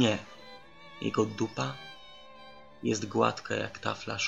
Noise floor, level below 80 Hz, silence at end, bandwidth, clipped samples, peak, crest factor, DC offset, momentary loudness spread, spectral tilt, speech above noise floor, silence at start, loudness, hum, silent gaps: -52 dBFS; -68 dBFS; 0 s; 8.2 kHz; under 0.1%; -10 dBFS; 22 dB; 0.2%; 22 LU; -4.5 dB/octave; 21 dB; 0 s; -32 LUFS; none; none